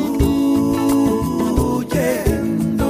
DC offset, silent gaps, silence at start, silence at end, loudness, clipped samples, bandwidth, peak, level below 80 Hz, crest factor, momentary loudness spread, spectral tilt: under 0.1%; none; 0 s; 0 s; -18 LUFS; under 0.1%; 15.5 kHz; -4 dBFS; -28 dBFS; 12 dB; 3 LU; -6.5 dB/octave